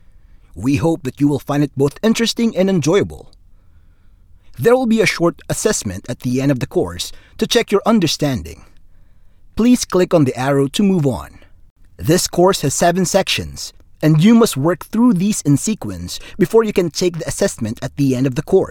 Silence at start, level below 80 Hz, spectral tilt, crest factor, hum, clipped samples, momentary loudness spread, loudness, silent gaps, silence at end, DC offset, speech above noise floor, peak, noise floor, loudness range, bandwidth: 0.55 s; -40 dBFS; -5 dB/octave; 16 dB; none; under 0.1%; 11 LU; -16 LUFS; 11.70-11.76 s; 0 s; under 0.1%; 30 dB; -2 dBFS; -46 dBFS; 4 LU; 18 kHz